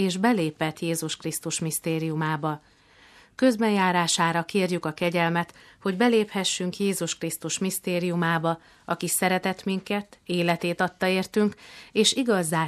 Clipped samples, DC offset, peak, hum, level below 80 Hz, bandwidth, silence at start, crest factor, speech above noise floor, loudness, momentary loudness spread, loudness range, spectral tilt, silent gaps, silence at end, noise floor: under 0.1%; under 0.1%; -8 dBFS; none; -66 dBFS; 14.5 kHz; 0 s; 18 dB; 29 dB; -25 LUFS; 9 LU; 3 LU; -4 dB/octave; none; 0 s; -54 dBFS